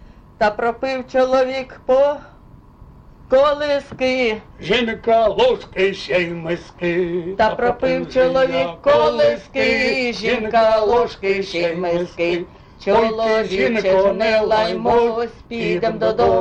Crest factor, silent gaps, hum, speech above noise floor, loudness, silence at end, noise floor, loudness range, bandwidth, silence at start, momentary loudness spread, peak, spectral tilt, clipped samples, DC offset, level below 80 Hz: 12 dB; none; none; 27 dB; -18 LUFS; 0 s; -44 dBFS; 2 LU; 8.4 kHz; 0.4 s; 7 LU; -6 dBFS; -5.5 dB/octave; under 0.1%; under 0.1%; -44 dBFS